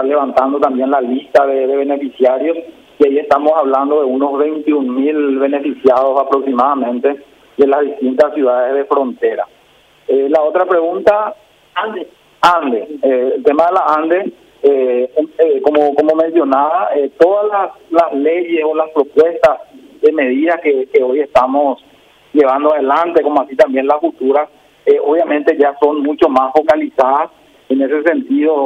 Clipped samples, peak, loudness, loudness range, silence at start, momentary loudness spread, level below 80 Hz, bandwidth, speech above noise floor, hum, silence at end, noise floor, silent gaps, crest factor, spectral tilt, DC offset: under 0.1%; 0 dBFS; -13 LUFS; 2 LU; 0 s; 6 LU; -56 dBFS; 8.8 kHz; 36 dB; none; 0 s; -49 dBFS; none; 12 dB; -5.5 dB/octave; under 0.1%